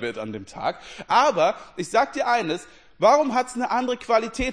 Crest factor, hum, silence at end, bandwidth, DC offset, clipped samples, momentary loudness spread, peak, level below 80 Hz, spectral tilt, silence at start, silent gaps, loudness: 18 dB; none; 0 s; 10.5 kHz; 0.2%; under 0.1%; 14 LU; -6 dBFS; -48 dBFS; -4 dB/octave; 0 s; none; -22 LUFS